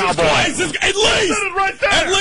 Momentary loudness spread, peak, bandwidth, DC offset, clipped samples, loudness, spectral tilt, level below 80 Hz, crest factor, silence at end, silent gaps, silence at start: 4 LU; -4 dBFS; 11.5 kHz; under 0.1%; under 0.1%; -15 LUFS; -2 dB/octave; -36 dBFS; 12 dB; 0 s; none; 0 s